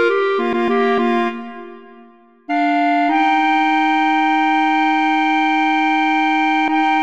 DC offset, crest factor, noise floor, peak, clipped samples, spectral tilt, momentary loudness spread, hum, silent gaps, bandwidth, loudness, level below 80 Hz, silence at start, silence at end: 0.7%; 12 dB; -46 dBFS; -4 dBFS; under 0.1%; -4 dB/octave; 5 LU; none; none; 7.6 kHz; -16 LUFS; -66 dBFS; 0 s; 0 s